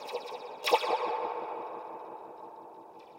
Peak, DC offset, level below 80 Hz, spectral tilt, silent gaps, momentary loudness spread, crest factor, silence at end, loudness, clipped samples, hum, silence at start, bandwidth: -10 dBFS; under 0.1%; -88 dBFS; -1.5 dB/octave; none; 20 LU; 26 dB; 0 s; -33 LUFS; under 0.1%; none; 0 s; 16 kHz